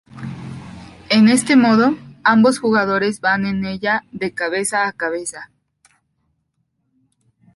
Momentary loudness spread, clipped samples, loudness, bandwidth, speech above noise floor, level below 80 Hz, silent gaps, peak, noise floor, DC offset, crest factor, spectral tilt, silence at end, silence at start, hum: 20 LU; under 0.1%; -16 LUFS; 11.5 kHz; 53 dB; -56 dBFS; none; -2 dBFS; -69 dBFS; under 0.1%; 16 dB; -4.5 dB/octave; 2.1 s; 0.15 s; none